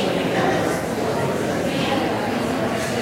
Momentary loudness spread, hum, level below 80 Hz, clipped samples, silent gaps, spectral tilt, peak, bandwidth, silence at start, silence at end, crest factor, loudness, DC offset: 3 LU; none; -48 dBFS; under 0.1%; none; -5 dB/octave; -6 dBFS; 16 kHz; 0 s; 0 s; 16 dB; -22 LUFS; under 0.1%